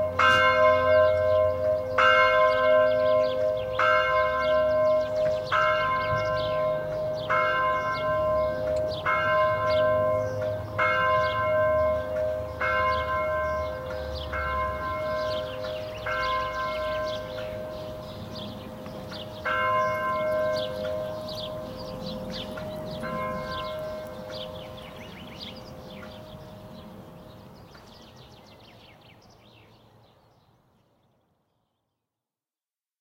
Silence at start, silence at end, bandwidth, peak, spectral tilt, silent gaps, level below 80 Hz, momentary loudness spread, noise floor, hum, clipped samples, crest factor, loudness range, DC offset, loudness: 0 s; 4.1 s; 16 kHz; -6 dBFS; -5 dB/octave; none; -48 dBFS; 19 LU; under -90 dBFS; none; under 0.1%; 20 dB; 17 LU; under 0.1%; -25 LUFS